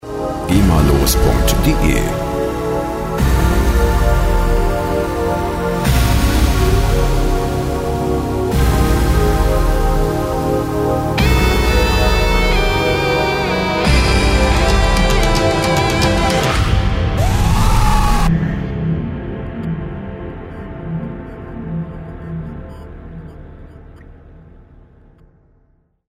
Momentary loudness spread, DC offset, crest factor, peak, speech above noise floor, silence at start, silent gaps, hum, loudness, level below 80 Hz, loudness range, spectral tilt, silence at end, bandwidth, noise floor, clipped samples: 14 LU; under 0.1%; 14 dB; 0 dBFS; 44 dB; 0.05 s; none; none; -16 LUFS; -18 dBFS; 14 LU; -5.5 dB/octave; 1.8 s; 16.5 kHz; -57 dBFS; under 0.1%